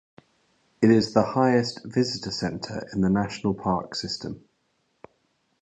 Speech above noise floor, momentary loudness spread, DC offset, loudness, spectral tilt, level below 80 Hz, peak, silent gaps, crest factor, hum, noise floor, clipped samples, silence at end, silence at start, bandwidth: 47 dB; 12 LU; under 0.1%; -25 LUFS; -6 dB/octave; -54 dBFS; -4 dBFS; none; 22 dB; none; -71 dBFS; under 0.1%; 1.25 s; 0.8 s; 9 kHz